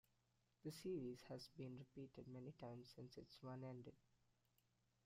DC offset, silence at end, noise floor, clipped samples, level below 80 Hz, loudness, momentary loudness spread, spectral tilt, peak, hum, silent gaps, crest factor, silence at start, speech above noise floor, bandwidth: under 0.1%; 1.05 s; -85 dBFS; under 0.1%; -84 dBFS; -56 LUFS; 10 LU; -6.5 dB/octave; -40 dBFS; none; none; 16 dB; 0.65 s; 29 dB; 15.5 kHz